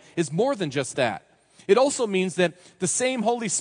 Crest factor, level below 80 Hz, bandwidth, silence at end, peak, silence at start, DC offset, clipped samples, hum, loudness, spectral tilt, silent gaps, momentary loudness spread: 18 dB; -72 dBFS; 10.5 kHz; 0 s; -6 dBFS; 0.15 s; under 0.1%; under 0.1%; none; -24 LUFS; -4 dB/octave; none; 7 LU